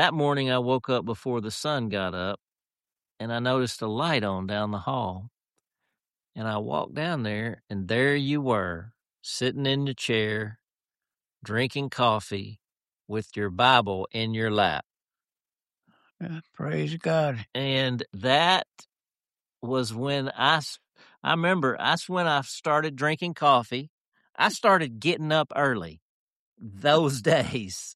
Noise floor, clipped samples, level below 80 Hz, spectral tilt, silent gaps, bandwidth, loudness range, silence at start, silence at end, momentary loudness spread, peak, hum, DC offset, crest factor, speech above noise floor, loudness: under -90 dBFS; under 0.1%; -64 dBFS; -5 dB/octave; 14.85-14.90 s, 21.18-21.22 s, 23.89-24.12 s, 26.02-26.56 s; 13 kHz; 5 LU; 0 s; 0.05 s; 13 LU; -4 dBFS; none; under 0.1%; 24 dB; over 64 dB; -26 LUFS